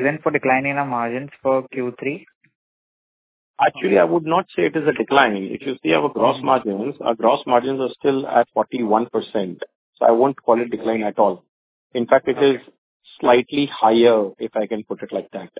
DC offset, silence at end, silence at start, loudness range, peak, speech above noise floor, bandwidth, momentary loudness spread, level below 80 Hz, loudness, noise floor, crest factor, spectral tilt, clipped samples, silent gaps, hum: under 0.1%; 0.15 s; 0 s; 4 LU; 0 dBFS; over 71 dB; 4 kHz; 11 LU; -62 dBFS; -19 LUFS; under -90 dBFS; 20 dB; -9.5 dB/octave; under 0.1%; 2.35-2.41 s, 2.55-3.54 s, 9.75-9.93 s, 11.48-11.90 s, 12.78-13.00 s; none